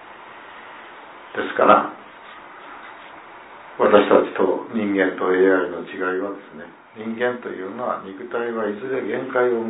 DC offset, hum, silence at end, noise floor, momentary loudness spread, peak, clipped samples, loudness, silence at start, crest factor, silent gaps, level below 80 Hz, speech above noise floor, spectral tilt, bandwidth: under 0.1%; none; 0 s; -41 dBFS; 24 LU; 0 dBFS; under 0.1%; -21 LUFS; 0 s; 20 dB; none; -66 dBFS; 21 dB; -9.5 dB/octave; 4 kHz